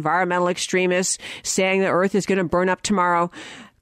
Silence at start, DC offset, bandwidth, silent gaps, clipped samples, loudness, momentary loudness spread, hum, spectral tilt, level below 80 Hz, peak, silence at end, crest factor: 0 s; under 0.1%; 15.5 kHz; none; under 0.1%; -20 LUFS; 6 LU; none; -4 dB/octave; -56 dBFS; -8 dBFS; 0.15 s; 12 dB